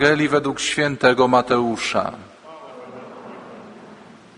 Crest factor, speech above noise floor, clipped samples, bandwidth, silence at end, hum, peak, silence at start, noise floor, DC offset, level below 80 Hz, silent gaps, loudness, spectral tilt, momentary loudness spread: 20 dB; 25 dB; under 0.1%; 10.5 kHz; 0.45 s; none; 0 dBFS; 0 s; -44 dBFS; under 0.1%; -56 dBFS; none; -19 LUFS; -4 dB/octave; 24 LU